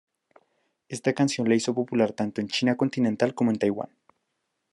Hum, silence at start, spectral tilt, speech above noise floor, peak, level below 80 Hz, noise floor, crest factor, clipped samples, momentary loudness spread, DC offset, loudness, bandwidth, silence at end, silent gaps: none; 0.9 s; -5.5 dB/octave; 54 dB; -8 dBFS; -74 dBFS; -78 dBFS; 18 dB; under 0.1%; 6 LU; under 0.1%; -25 LUFS; 11.5 kHz; 0.85 s; none